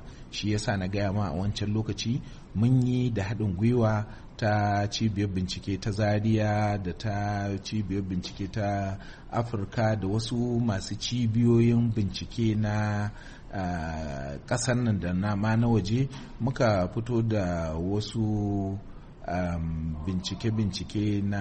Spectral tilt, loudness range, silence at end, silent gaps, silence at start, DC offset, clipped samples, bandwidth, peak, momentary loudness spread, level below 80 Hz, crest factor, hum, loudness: -6.5 dB/octave; 4 LU; 0 s; none; 0 s; under 0.1%; under 0.1%; 8.4 kHz; -12 dBFS; 9 LU; -44 dBFS; 16 dB; none; -28 LUFS